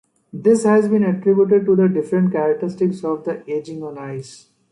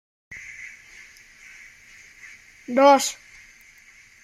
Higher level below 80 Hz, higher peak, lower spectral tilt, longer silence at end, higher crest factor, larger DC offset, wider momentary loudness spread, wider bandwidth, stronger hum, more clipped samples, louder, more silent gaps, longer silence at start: about the same, -64 dBFS vs -66 dBFS; about the same, -4 dBFS vs -4 dBFS; first, -8 dB/octave vs -2 dB/octave; second, 0.35 s vs 1.1 s; second, 14 dB vs 22 dB; neither; second, 16 LU vs 29 LU; second, 11 kHz vs 15.5 kHz; neither; neither; about the same, -18 LUFS vs -18 LUFS; neither; about the same, 0.35 s vs 0.3 s